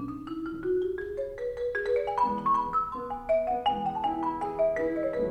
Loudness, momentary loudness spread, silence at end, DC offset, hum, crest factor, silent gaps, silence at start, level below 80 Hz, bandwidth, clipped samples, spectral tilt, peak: -29 LUFS; 8 LU; 0 s; under 0.1%; none; 14 dB; none; 0 s; -52 dBFS; 9.8 kHz; under 0.1%; -6.5 dB/octave; -16 dBFS